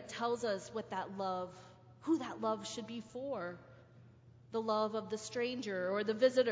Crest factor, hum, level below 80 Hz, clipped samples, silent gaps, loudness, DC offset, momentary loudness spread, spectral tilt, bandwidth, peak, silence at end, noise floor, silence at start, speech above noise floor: 20 dB; none; -74 dBFS; under 0.1%; none; -38 LUFS; under 0.1%; 11 LU; -4.5 dB/octave; 8 kHz; -18 dBFS; 0 s; -60 dBFS; 0 s; 24 dB